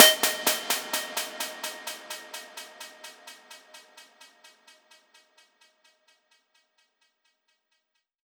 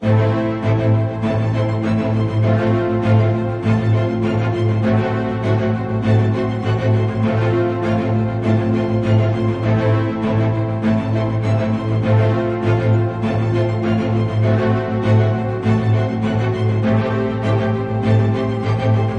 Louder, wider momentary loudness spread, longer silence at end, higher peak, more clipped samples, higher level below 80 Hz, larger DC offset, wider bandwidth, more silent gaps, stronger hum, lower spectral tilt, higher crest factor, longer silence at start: second, -27 LUFS vs -18 LUFS; first, 24 LU vs 3 LU; first, 4.25 s vs 0 s; about the same, 0 dBFS vs -2 dBFS; neither; second, under -90 dBFS vs -42 dBFS; neither; first, over 20 kHz vs 6.6 kHz; neither; neither; second, 2 dB/octave vs -9 dB/octave; first, 30 dB vs 14 dB; about the same, 0 s vs 0 s